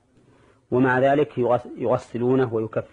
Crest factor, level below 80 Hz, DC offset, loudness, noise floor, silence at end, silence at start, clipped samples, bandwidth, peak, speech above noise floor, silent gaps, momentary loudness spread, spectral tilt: 14 dB; -60 dBFS; under 0.1%; -22 LUFS; -56 dBFS; 0.05 s; 0.7 s; under 0.1%; 9.4 kHz; -8 dBFS; 35 dB; none; 6 LU; -8.5 dB/octave